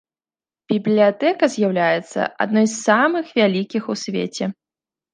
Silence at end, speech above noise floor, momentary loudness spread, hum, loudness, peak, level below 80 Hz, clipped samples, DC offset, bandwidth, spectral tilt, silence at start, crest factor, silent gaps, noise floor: 0.6 s; over 72 dB; 9 LU; none; -19 LUFS; -2 dBFS; -70 dBFS; under 0.1%; under 0.1%; 9.8 kHz; -5 dB/octave; 0.7 s; 18 dB; none; under -90 dBFS